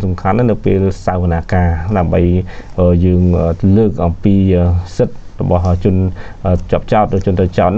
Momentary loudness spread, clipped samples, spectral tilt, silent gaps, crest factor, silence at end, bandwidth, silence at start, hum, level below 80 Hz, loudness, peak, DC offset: 6 LU; under 0.1%; -9.5 dB/octave; none; 10 dB; 0 s; 7.4 kHz; 0 s; none; -26 dBFS; -14 LUFS; -2 dBFS; under 0.1%